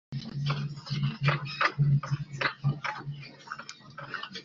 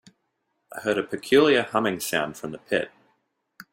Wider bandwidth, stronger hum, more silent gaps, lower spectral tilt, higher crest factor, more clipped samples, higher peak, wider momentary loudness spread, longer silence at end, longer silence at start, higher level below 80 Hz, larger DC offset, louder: second, 7.4 kHz vs 16.5 kHz; neither; neither; about the same, -4.5 dB/octave vs -4 dB/octave; about the same, 22 dB vs 20 dB; neither; about the same, -8 dBFS vs -6 dBFS; about the same, 15 LU vs 16 LU; second, 0 s vs 0.85 s; second, 0.1 s vs 0.7 s; about the same, -60 dBFS vs -64 dBFS; neither; second, -31 LUFS vs -24 LUFS